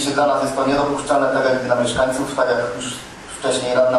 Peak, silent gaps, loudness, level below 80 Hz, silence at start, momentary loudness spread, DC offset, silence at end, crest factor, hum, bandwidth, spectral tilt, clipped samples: -2 dBFS; none; -19 LUFS; -46 dBFS; 0 s; 9 LU; under 0.1%; 0 s; 16 dB; none; 12.5 kHz; -4 dB/octave; under 0.1%